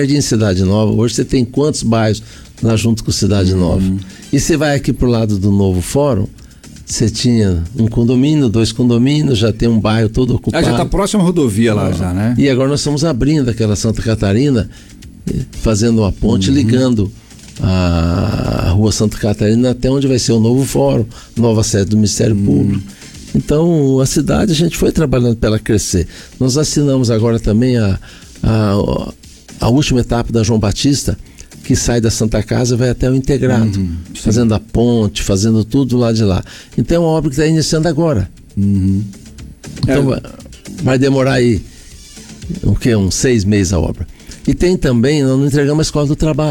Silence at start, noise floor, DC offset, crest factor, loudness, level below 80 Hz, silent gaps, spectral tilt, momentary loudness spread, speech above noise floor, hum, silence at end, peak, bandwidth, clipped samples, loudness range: 0 s; -35 dBFS; under 0.1%; 10 dB; -14 LUFS; -28 dBFS; none; -6 dB/octave; 8 LU; 22 dB; none; 0 s; -4 dBFS; 18 kHz; under 0.1%; 2 LU